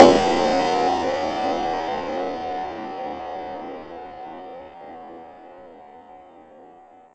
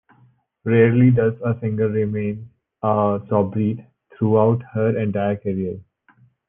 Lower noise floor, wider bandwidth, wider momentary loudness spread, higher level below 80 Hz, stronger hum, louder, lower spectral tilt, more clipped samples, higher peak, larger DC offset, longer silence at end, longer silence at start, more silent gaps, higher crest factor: second, -48 dBFS vs -57 dBFS; first, 8.8 kHz vs 3.5 kHz; first, 24 LU vs 12 LU; first, -52 dBFS vs -58 dBFS; neither; second, -23 LUFS vs -20 LUFS; second, -4.5 dB/octave vs -12.5 dB/octave; neither; first, 0 dBFS vs -4 dBFS; neither; second, 0.45 s vs 0.65 s; second, 0 s vs 0.65 s; neither; first, 22 dB vs 16 dB